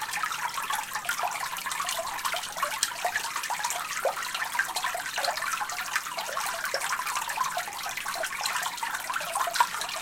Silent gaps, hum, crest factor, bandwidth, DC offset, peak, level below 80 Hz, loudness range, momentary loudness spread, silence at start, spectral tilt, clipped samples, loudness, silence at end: none; none; 26 dB; 17 kHz; under 0.1%; -6 dBFS; -64 dBFS; 1 LU; 3 LU; 0 s; 1 dB/octave; under 0.1%; -29 LUFS; 0 s